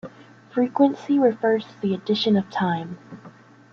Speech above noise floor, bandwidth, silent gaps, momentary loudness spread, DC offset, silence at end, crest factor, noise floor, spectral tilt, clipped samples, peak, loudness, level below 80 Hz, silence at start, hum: 26 dB; 7 kHz; none; 12 LU; under 0.1%; 0.45 s; 18 dB; -47 dBFS; -7.5 dB/octave; under 0.1%; -6 dBFS; -22 LUFS; -68 dBFS; 0.05 s; none